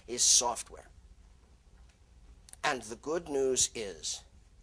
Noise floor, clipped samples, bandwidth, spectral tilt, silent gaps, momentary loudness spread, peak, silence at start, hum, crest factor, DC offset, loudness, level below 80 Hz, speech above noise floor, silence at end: -59 dBFS; under 0.1%; 14 kHz; -0.5 dB/octave; none; 16 LU; -12 dBFS; 0.1 s; none; 22 dB; under 0.1%; -30 LUFS; -58 dBFS; 28 dB; 0.4 s